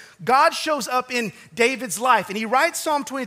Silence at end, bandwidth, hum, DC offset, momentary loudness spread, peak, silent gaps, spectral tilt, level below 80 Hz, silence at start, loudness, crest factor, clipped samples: 0 s; 16 kHz; none; under 0.1%; 7 LU; -4 dBFS; none; -2.5 dB/octave; -70 dBFS; 0 s; -21 LUFS; 18 dB; under 0.1%